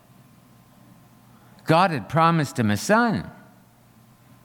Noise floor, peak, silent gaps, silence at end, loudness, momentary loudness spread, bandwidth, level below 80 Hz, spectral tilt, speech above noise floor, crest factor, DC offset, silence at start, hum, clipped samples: -54 dBFS; -6 dBFS; none; 1.15 s; -21 LUFS; 11 LU; 18 kHz; -60 dBFS; -6 dB/octave; 34 dB; 18 dB; under 0.1%; 1.65 s; none; under 0.1%